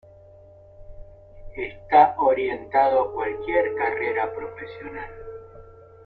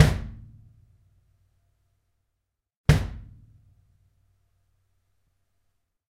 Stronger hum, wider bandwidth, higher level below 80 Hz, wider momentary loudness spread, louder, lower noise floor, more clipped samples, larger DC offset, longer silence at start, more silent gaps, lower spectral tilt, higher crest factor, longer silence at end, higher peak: neither; second, 4.7 kHz vs 15.5 kHz; second, -50 dBFS vs -40 dBFS; second, 20 LU vs 23 LU; first, -22 LUFS vs -25 LUFS; second, -49 dBFS vs -81 dBFS; neither; neither; first, 0.8 s vs 0 s; second, none vs 2.77-2.84 s; first, -8 dB/octave vs -6.5 dB/octave; second, 22 dB vs 28 dB; second, 0.25 s vs 2.9 s; about the same, -4 dBFS vs -2 dBFS